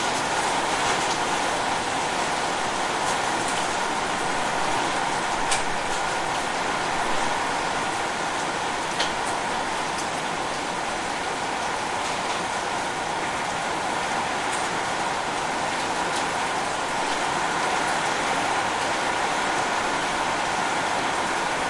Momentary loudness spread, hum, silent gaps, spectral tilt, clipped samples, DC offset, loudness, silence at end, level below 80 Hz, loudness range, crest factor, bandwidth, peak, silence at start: 3 LU; none; none; -2 dB/octave; under 0.1%; under 0.1%; -25 LUFS; 0 s; -50 dBFS; 2 LU; 16 dB; 11.5 kHz; -10 dBFS; 0 s